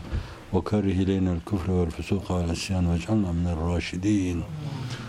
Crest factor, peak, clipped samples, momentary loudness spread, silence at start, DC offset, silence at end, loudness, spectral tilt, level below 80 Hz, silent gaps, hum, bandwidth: 16 dB; -10 dBFS; under 0.1%; 8 LU; 0 s; under 0.1%; 0 s; -27 LUFS; -7 dB/octave; -42 dBFS; none; none; 12.5 kHz